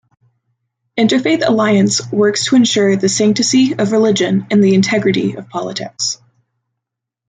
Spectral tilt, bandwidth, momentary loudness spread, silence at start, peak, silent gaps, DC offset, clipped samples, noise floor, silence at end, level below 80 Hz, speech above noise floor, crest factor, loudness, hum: -4.5 dB/octave; 9.4 kHz; 10 LU; 0.95 s; -2 dBFS; none; under 0.1%; under 0.1%; -80 dBFS; 1.15 s; -58 dBFS; 67 dB; 12 dB; -13 LUFS; none